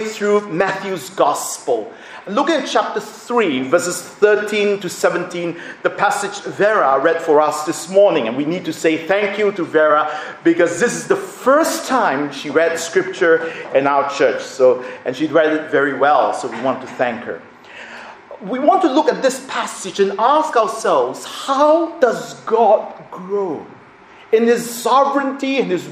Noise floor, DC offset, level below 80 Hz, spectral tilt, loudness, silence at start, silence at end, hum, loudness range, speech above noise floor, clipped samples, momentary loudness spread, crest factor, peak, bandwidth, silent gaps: -43 dBFS; under 0.1%; -66 dBFS; -4 dB/octave; -17 LUFS; 0 s; 0 s; none; 3 LU; 26 dB; under 0.1%; 10 LU; 16 dB; 0 dBFS; 15.5 kHz; none